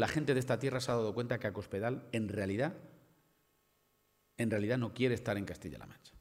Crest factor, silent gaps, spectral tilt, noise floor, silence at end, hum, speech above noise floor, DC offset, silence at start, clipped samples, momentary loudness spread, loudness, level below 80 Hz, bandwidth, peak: 20 dB; none; -6 dB/octave; -75 dBFS; 0 s; 50 Hz at -60 dBFS; 40 dB; under 0.1%; 0 s; under 0.1%; 12 LU; -36 LUFS; -66 dBFS; 16 kHz; -16 dBFS